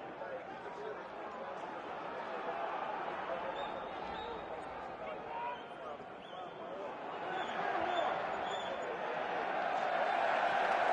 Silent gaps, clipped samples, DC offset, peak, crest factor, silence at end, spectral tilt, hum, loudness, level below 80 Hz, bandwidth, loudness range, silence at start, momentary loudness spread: none; under 0.1%; under 0.1%; -20 dBFS; 20 dB; 0 s; -4 dB/octave; none; -39 LUFS; -72 dBFS; 9.8 kHz; 8 LU; 0 s; 12 LU